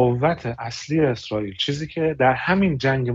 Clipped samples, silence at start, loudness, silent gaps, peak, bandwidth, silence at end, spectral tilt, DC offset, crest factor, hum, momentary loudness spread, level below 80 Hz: under 0.1%; 0 s; -22 LUFS; none; -4 dBFS; 7.8 kHz; 0 s; -6 dB/octave; under 0.1%; 16 dB; none; 8 LU; -48 dBFS